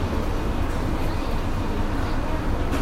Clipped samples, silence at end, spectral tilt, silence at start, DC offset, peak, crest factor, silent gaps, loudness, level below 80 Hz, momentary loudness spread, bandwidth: under 0.1%; 0 s; -6.5 dB/octave; 0 s; under 0.1%; -10 dBFS; 12 dB; none; -27 LUFS; -26 dBFS; 1 LU; 14.5 kHz